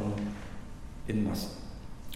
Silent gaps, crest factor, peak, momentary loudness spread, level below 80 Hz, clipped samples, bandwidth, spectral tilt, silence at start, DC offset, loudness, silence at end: none; 16 dB; -20 dBFS; 15 LU; -46 dBFS; under 0.1%; 16 kHz; -6 dB/octave; 0 s; under 0.1%; -36 LUFS; 0 s